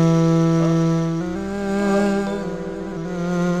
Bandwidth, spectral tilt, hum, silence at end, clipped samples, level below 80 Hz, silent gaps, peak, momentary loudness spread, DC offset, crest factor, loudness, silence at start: 9 kHz; -7.5 dB/octave; none; 0 s; under 0.1%; -44 dBFS; none; -6 dBFS; 11 LU; 0.5%; 12 dB; -21 LUFS; 0 s